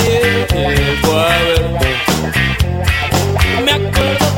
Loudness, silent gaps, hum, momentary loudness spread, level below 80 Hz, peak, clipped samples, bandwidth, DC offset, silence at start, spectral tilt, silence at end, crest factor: -13 LUFS; none; none; 3 LU; -24 dBFS; 0 dBFS; under 0.1%; 16.5 kHz; under 0.1%; 0 s; -4.5 dB/octave; 0 s; 14 dB